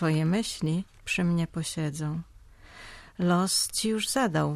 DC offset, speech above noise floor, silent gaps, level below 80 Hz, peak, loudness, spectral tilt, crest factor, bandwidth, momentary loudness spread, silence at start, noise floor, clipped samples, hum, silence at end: under 0.1%; 23 dB; none; -54 dBFS; -12 dBFS; -28 LUFS; -4.5 dB/octave; 16 dB; 15 kHz; 15 LU; 0 s; -50 dBFS; under 0.1%; none; 0 s